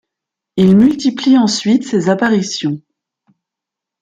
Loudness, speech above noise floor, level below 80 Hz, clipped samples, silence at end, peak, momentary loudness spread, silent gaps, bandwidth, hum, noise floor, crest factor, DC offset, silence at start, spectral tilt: -13 LUFS; 71 dB; -52 dBFS; under 0.1%; 1.25 s; -2 dBFS; 11 LU; none; 9.2 kHz; none; -83 dBFS; 12 dB; under 0.1%; 0.55 s; -5.5 dB/octave